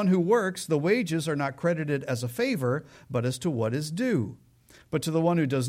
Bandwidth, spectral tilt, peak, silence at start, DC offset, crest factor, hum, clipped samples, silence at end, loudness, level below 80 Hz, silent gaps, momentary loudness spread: 16.5 kHz; -6 dB/octave; -12 dBFS; 0 s; under 0.1%; 16 dB; none; under 0.1%; 0 s; -27 LUFS; -64 dBFS; none; 7 LU